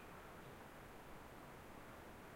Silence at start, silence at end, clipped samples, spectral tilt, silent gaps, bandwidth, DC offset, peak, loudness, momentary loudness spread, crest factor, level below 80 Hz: 0 s; 0 s; under 0.1%; -5 dB/octave; none; 16 kHz; under 0.1%; -44 dBFS; -57 LUFS; 1 LU; 14 dB; -68 dBFS